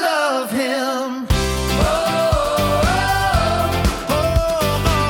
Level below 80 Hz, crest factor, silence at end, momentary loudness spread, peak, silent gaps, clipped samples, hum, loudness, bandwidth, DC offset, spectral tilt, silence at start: -26 dBFS; 16 dB; 0 s; 3 LU; -2 dBFS; none; under 0.1%; none; -18 LUFS; 19 kHz; under 0.1%; -4.5 dB/octave; 0 s